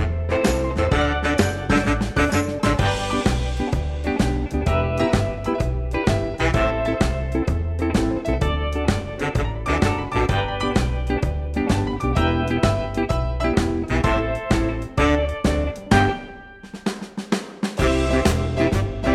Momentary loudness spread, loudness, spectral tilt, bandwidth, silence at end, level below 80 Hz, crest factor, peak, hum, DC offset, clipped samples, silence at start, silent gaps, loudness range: 5 LU; -22 LUFS; -6 dB/octave; 14 kHz; 0 s; -28 dBFS; 18 dB; -4 dBFS; none; under 0.1%; under 0.1%; 0 s; none; 2 LU